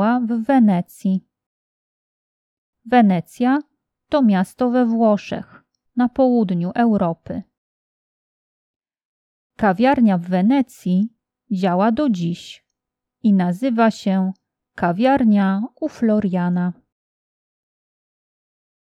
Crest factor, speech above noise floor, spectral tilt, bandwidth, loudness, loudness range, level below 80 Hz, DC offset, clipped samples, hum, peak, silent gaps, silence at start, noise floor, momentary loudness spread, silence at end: 18 dB; 66 dB; -8 dB/octave; 12.5 kHz; -19 LUFS; 4 LU; -58 dBFS; under 0.1%; under 0.1%; none; 0 dBFS; 1.46-2.73 s, 7.58-8.80 s, 9.05-9.50 s; 0 s; -83 dBFS; 11 LU; 2.1 s